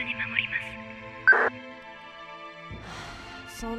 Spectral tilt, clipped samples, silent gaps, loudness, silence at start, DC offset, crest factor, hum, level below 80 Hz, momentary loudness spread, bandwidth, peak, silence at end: -3.5 dB/octave; under 0.1%; none; -24 LUFS; 0 s; under 0.1%; 22 dB; none; -54 dBFS; 22 LU; 13.5 kHz; -8 dBFS; 0 s